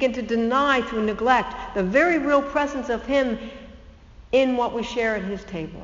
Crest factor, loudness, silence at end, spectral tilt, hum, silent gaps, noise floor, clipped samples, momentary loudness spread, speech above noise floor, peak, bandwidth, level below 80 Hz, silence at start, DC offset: 18 dB; -22 LUFS; 0 s; -3 dB/octave; none; none; -46 dBFS; under 0.1%; 12 LU; 23 dB; -4 dBFS; 7.6 kHz; -46 dBFS; 0 s; under 0.1%